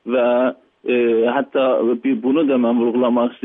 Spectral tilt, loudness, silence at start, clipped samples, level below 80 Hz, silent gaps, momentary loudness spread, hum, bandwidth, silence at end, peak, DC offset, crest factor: -9.5 dB/octave; -17 LUFS; 0.05 s; under 0.1%; -74 dBFS; none; 3 LU; none; 3.9 kHz; 0.1 s; -6 dBFS; under 0.1%; 12 dB